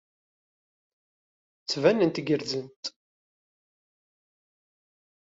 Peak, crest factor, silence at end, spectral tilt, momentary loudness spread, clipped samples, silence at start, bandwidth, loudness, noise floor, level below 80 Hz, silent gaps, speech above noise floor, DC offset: -8 dBFS; 24 dB; 2.4 s; -4.5 dB/octave; 16 LU; under 0.1%; 1.7 s; 7.8 kHz; -26 LUFS; under -90 dBFS; -74 dBFS; 2.76-2.83 s; over 64 dB; under 0.1%